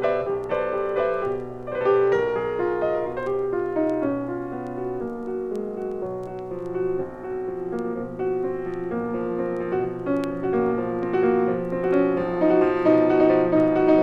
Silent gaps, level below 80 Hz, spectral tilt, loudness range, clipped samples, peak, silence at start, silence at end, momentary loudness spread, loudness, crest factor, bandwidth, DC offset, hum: none; -52 dBFS; -8.5 dB/octave; 8 LU; under 0.1%; -6 dBFS; 0 s; 0 s; 11 LU; -24 LUFS; 18 dB; 6.4 kHz; under 0.1%; none